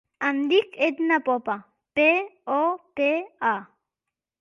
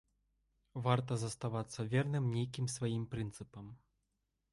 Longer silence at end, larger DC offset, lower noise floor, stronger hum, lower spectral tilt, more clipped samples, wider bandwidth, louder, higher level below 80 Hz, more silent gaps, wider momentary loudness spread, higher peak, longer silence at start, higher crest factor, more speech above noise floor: about the same, 0.75 s vs 0.75 s; neither; about the same, -87 dBFS vs -84 dBFS; neither; about the same, -5 dB/octave vs -6 dB/octave; neither; second, 7.2 kHz vs 11.5 kHz; first, -24 LUFS vs -38 LUFS; second, -74 dBFS vs -66 dBFS; neither; second, 9 LU vs 16 LU; first, -8 dBFS vs -16 dBFS; second, 0.2 s vs 0.75 s; about the same, 18 dB vs 22 dB; first, 64 dB vs 47 dB